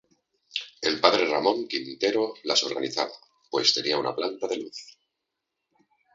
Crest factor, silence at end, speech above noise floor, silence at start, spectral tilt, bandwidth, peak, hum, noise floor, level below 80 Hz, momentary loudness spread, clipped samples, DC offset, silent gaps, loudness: 28 dB; 1.25 s; 56 dB; 0.55 s; -2 dB/octave; 8 kHz; 0 dBFS; none; -83 dBFS; -70 dBFS; 13 LU; under 0.1%; under 0.1%; none; -25 LUFS